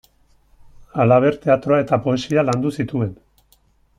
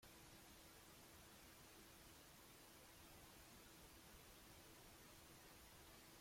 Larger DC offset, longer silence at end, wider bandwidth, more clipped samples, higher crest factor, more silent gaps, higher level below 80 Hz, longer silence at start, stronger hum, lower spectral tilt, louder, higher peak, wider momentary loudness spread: neither; first, 0.85 s vs 0 s; second, 12 kHz vs 16.5 kHz; neither; about the same, 16 dB vs 14 dB; neither; first, -52 dBFS vs -76 dBFS; first, 0.95 s vs 0 s; neither; first, -7.5 dB/octave vs -2.5 dB/octave; first, -18 LUFS vs -63 LUFS; first, -2 dBFS vs -50 dBFS; first, 9 LU vs 0 LU